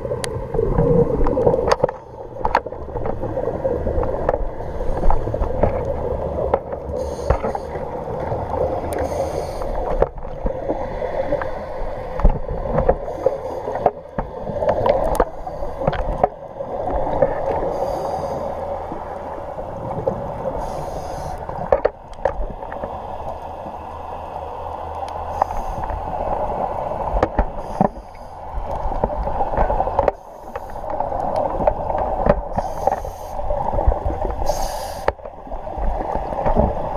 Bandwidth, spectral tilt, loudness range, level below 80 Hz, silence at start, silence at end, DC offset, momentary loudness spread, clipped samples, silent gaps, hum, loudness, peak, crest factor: 14.5 kHz; -7 dB/octave; 4 LU; -28 dBFS; 0 s; 0 s; under 0.1%; 10 LU; under 0.1%; none; none; -23 LUFS; 0 dBFS; 22 dB